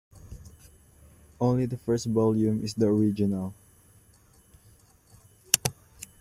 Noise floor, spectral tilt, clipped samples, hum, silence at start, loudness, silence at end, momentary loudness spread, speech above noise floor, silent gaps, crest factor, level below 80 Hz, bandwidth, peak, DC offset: -59 dBFS; -5 dB/octave; under 0.1%; none; 0.25 s; -26 LUFS; 0.15 s; 23 LU; 33 dB; none; 30 dB; -56 dBFS; 16 kHz; 0 dBFS; under 0.1%